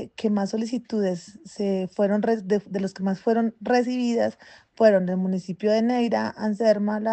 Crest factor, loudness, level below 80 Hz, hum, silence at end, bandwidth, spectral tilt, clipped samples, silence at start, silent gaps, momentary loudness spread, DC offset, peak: 18 dB; -24 LUFS; -68 dBFS; none; 0 s; 8.6 kHz; -7 dB/octave; under 0.1%; 0 s; none; 7 LU; under 0.1%; -6 dBFS